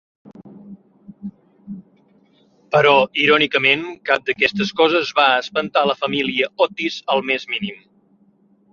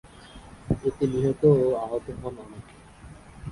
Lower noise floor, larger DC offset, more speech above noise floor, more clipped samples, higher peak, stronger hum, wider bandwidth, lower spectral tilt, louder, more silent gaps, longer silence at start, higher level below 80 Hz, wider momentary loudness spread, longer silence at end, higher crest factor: first, -57 dBFS vs -47 dBFS; neither; first, 39 dB vs 22 dB; neither; first, -2 dBFS vs -8 dBFS; neither; second, 7.4 kHz vs 11.5 kHz; second, -4.5 dB/octave vs -9 dB/octave; first, -17 LUFS vs -25 LUFS; neither; about the same, 0.25 s vs 0.15 s; second, -62 dBFS vs -48 dBFS; second, 22 LU vs 26 LU; first, 0.95 s vs 0 s; about the same, 20 dB vs 18 dB